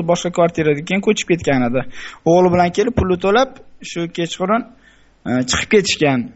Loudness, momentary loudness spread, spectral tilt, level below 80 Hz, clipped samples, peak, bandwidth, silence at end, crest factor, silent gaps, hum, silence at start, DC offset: -17 LUFS; 10 LU; -5 dB/octave; -40 dBFS; under 0.1%; -2 dBFS; 8.2 kHz; 0.05 s; 16 dB; none; none; 0 s; under 0.1%